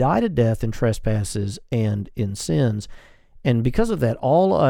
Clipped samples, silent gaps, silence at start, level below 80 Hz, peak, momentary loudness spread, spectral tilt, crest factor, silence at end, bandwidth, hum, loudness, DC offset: under 0.1%; none; 0 s; -36 dBFS; -6 dBFS; 8 LU; -7 dB/octave; 14 dB; 0 s; 14.5 kHz; none; -22 LUFS; under 0.1%